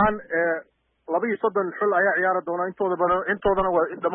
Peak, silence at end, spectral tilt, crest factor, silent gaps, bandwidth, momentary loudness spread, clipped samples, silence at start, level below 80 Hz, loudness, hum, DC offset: -10 dBFS; 0 s; -10.5 dB/octave; 14 dB; none; 3.7 kHz; 6 LU; under 0.1%; 0 s; -50 dBFS; -23 LUFS; none; under 0.1%